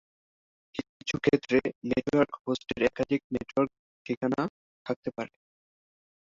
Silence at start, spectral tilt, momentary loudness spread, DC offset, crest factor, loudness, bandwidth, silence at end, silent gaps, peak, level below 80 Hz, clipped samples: 0.75 s; -6 dB/octave; 14 LU; under 0.1%; 22 dB; -30 LUFS; 7.6 kHz; 1.05 s; 0.89-1.00 s, 1.75-1.81 s, 2.41-2.45 s, 3.24-3.30 s, 3.79-4.05 s, 4.17-4.21 s, 4.50-4.85 s, 4.96-5.03 s; -10 dBFS; -60 dBFS; under 0.1%